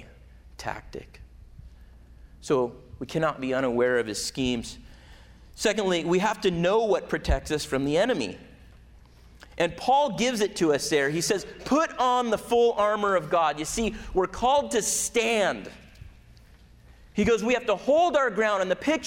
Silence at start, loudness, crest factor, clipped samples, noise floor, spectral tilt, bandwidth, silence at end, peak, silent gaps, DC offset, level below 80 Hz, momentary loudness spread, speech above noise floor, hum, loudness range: 0 s; -25 LUFS; 16 dB; under 0.1%; -52 dBFS; -4 dB/octave; 16.5 kHz; 0 s; -12 dBFS; none; under 0.1%; -44 dBFS; 12 LU; 27 dB; none; 4 LU